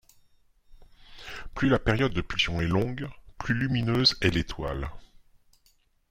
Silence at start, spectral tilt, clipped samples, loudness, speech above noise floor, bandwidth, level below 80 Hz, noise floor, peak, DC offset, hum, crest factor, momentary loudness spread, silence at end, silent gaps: 0.7 s; -5.5 dB/octave; under 0.1%; -26 LUFS; 39 dB; 15.5 kHz; -42 dBFS; -65 dBFS; -8 dBFS; under 0.1%; none; 22 dB; 18 LU; 1.05 s; none